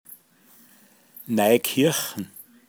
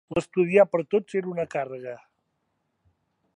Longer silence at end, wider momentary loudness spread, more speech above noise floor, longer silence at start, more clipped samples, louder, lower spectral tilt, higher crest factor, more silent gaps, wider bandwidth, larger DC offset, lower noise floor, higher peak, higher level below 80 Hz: second, 0.25 s vs 1.4 s; about the same, 19 LU vs 18 LU; second, 34 dB vs 51 dB; about the same, 0.1 s vs 0.1 s; neither; about the same, -22 LUFS vs -24 LUFS; second, -4 dB/octave vs -7 dB/octave; about the same, 20 dB vs 20 dB; neither; first, over 20 kHz vs 10.5 kHz; neither; second, -56 dBFS vs -76 dBFS; about the same, -4 dBFS vs -6 dBFS; second, -74 dBFS vs -64 dBFS